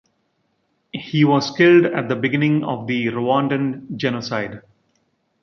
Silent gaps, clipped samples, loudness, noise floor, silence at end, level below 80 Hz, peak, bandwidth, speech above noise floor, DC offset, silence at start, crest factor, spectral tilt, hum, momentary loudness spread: none; under 0.1%; -19 LUFS; -68 dBFS; 0.85 s; -62 dBFS; -2 dBFS; 6.8 kHz; 50 dB; under 0.1%; 0.95 s; 18 dB; -6.5 dB/octave; none; 12 LU